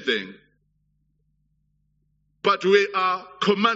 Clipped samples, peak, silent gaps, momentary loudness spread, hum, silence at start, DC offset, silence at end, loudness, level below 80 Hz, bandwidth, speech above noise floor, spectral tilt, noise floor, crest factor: under 0.1%; -4 dBFS; none; 8 LU; 50 Hz at -60 dBFS; 0 s; under 0.1%; 0 s; -22 LUFS; -72 dBFS; 7.6 kHz; 47 dB; -2 dB/octave; -69 dBFS; 20 dB